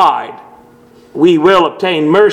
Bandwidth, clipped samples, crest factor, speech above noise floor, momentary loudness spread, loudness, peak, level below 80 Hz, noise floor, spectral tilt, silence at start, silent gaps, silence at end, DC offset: 10 kHz; 0.3%; 12 dB; 32 dB; 17 LU; -11 LUFS; 0 dBFS; -52 dBFS; -42 dBFS; -6 dB/octave; 0 s; none; 0 s; under 0.1%